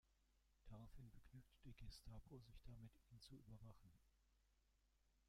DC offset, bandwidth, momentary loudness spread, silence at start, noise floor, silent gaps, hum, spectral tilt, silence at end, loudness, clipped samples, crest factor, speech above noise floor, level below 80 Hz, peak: under 0.1%; 15 kHz; 5 LU; 0.05 s; -82 dBFS; none; none; -6 dB/octave; 0 s; -65 LUFS; under 0.1%; 16 dB; 20 dB; -70 dBFS; -48 dBFS